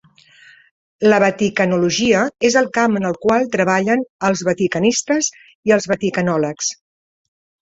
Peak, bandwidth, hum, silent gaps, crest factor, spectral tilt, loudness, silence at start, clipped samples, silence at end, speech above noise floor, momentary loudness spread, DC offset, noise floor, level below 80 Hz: -2 dBFS; 8.4 kHz; none; 4.10-4.19 s, 5.55-5.63 s; 16 dB; -4 dB/octave; -17 LUFS; 1 s; under 0.1%; 0.9 s; 31 dB; 5 LU; under 0.1%; -48 dBFS; -56 dBFS